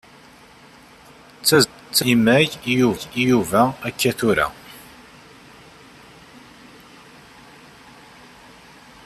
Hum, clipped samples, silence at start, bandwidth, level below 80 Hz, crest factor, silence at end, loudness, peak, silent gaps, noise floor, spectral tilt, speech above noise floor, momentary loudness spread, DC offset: none; under 0.1%; 1.45 s; 14.5 kHz; -54 dBFS; 22 dB; 4.25 s; -18 LUFS; -2 dBFS; none; -47 dBFS; -4 dB/octave; 29 dB; 8 LU; under 0.1%